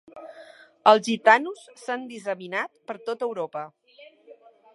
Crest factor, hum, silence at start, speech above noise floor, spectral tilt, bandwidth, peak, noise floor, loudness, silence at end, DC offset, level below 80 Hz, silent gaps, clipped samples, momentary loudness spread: 24 dB; none; 0.15 s; 29 dB; -3.5 dB/octave; 11.5 kHz; -2 dBFS; -52 dBFS; -24 LUFS; 0.4 s; under 0.1%; -84 dBFS; none; under 0.1%; 22 LU